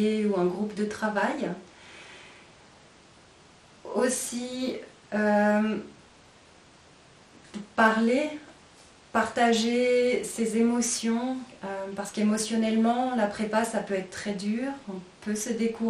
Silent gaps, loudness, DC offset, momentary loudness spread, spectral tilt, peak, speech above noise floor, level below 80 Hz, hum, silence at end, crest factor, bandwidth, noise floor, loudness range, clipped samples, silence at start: none; -27 LUFS; under 0.1%; 17 LU; -4 dB/octave; -8 dBFS; 28 dB; -66 dBFS; none; 0 s; 20 dB; 13 kHz; -55 dBFS; 8 LU; under 0.1%; 0 s